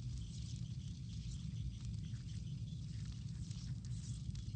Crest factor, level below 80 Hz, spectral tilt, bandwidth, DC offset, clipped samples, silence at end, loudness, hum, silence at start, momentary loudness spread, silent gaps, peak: 14 dB; -52 dBFS; -6 dB/octave; 9.2 kHz; under 0.1%; under 0.1%; 0 s; -47 LUFS; none; 0 s; 1 LU; none; -32 dBFS